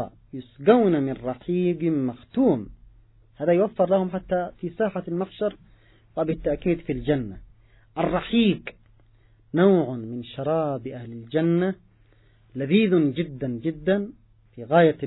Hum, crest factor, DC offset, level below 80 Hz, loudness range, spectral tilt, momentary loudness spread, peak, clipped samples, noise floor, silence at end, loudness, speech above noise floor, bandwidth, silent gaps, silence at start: none; 20 dB; under 0.1%; -50 dBFS; 3 LU; -11.5 dB/octave; 16 LU; -4 dBFS; under 0.1%; -57 dBFS; 0 s; -24 LUFS; 34 dB; 4.1 kHz; none; 0 s